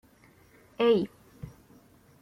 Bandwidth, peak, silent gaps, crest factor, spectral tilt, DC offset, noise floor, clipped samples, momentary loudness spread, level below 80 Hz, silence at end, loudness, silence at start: 14 kHz; -14 dBFS; none; 18 dB; -7 dB/octave; under 0.1%; -59 dBFS; under 0.1%; 23 LU; -64 dBFS; 0.75 s; -27 LUFS; 0.8 s